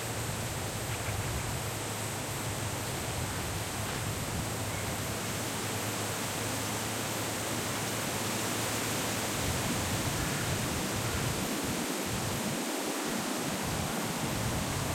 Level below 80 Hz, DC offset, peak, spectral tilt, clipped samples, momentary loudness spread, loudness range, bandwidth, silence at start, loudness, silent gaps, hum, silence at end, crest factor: -50 dBFS; under 0.1%; -18 dBFS; -3.5 dB/octave; under 0.1%; 3 LU; 3 LU; 16.5 kHz; 0 s; -33 LUFS; none; none; 0 s; 14 dB